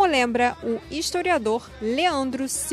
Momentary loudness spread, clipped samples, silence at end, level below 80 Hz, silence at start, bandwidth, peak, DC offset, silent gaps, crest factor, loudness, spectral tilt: 7 LU; under 0.1%; 0 s; -50 dBFS; 0 s; 15.5 kHz; -8 dBFS; under 0.1%; none; 16 dB; -24 LUFS; -2.5 dB/octave